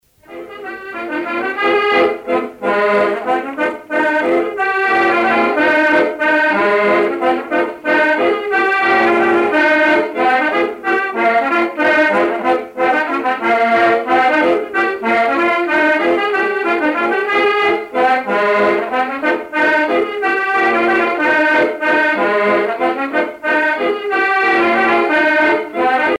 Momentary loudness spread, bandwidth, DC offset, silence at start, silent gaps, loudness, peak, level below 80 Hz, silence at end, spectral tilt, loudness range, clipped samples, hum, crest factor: 6 LU; 12.5 kHz; under 0.1%; 0.3 s; none; -14 LUFS; -2 dBFS; -58 dBFS; 0.05 s; -5 dB/octave; 2 LU; under 0.1%; none; 12 dB